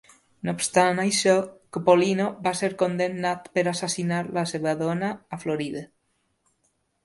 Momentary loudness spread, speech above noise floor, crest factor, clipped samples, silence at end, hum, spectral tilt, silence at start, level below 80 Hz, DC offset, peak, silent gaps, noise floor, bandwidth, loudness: 11 LU; 48 dB; 20 dB; under 0.1%; 1.2 s; none; -4.5 dB/octave; 0.45 s; -66 dBFS; under 0.1%; -4 dBFS; none; -72 dBFS; 11.5 kHz; -24 LUFS